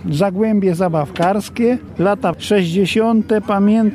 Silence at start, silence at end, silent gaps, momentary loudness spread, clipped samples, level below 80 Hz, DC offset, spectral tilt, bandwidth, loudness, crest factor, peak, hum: 0 s; 0 s; none; 3 LU; under 0.1%; -48 dBFS; under 0.1%; -7 dB/octave; 14.5 kHz; -16 LUFS; 12 dB; -4 dBFS; none